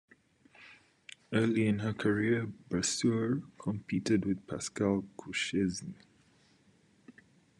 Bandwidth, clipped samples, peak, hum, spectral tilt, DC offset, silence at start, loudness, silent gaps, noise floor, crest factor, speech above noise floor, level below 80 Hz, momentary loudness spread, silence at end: 12 kHz; under 0.1%; -16 dBFS; none; -5 dB/octave; under 0.1%; 0.6 s; -32 LUFS; none; -66 dBFS; 18 dB; 34 dB; -70 dBFS; 10 LU; 0.5 s